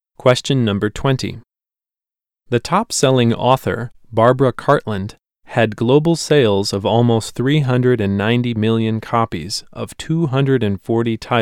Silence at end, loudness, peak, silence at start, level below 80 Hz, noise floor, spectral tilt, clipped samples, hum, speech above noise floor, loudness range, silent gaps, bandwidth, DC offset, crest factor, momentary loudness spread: 0 s; -17 LUFS; 0 dBFS; 0.25 s; -46 dBFS; under -90 dBFS; -6 dB/octave; under 0.1%; none; over 74 dB; 3 LU; none; 15.5 kHz; under 0.1%; 16 dB; 9 LU